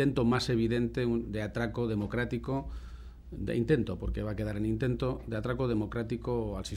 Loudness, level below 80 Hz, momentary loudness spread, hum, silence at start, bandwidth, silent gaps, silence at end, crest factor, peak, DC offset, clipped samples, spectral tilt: -32 LUFS; -44 dBFS; 8 LU; none; 0 s; 13.5 kHz; none; 0 s; 18 dB; -14 dBFS; under 0.1%; under 0.1%; -7 dB/octave